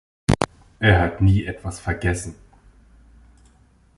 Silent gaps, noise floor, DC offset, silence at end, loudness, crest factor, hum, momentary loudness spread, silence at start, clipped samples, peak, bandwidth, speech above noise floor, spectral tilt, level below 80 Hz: none; -55 dBFS; under 0.1%; 1.65 s; -21 LUFS; 22 dB; none; 12 LU; 0.3 s; under 0.1%; -2 dBFS; 11.5 kHz; 36 dB; -6 dB/octave; -34 dBFS